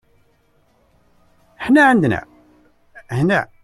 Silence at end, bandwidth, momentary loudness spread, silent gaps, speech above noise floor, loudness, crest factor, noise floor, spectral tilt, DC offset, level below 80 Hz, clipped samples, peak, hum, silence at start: 0.2 s; 12.5 kHz; 15 LU; none; 44 dB; -16 LUFS; 18 dB; -59 dBFS; -7 dB/octave; under 0.1%; -52 dBFS; under 0.1%; -2 dBFS; none; 1.6 s